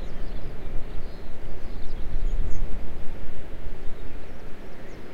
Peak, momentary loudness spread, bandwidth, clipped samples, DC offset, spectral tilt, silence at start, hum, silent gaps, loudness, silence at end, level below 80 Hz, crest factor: -6 dBFS; 9 LU; 4.3 kHz; under 0.1%; under 0.1%; -7 dB/octave; 0 s; none; none; -39 LUFS; 0 s; -30 dBFS; 12 dB